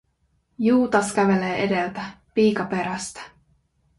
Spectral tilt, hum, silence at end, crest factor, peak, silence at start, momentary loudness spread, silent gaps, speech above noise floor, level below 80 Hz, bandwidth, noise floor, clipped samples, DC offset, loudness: -5.5 dB/octave; none; 0.7 s; 18 dB; -4 dBFS; 0.6 s; 12 LU; none; 46 dB; -58 dBFS; 11.5 kHz; -68 dBFS; under 0.1%; under 0.1%; -22 LUFS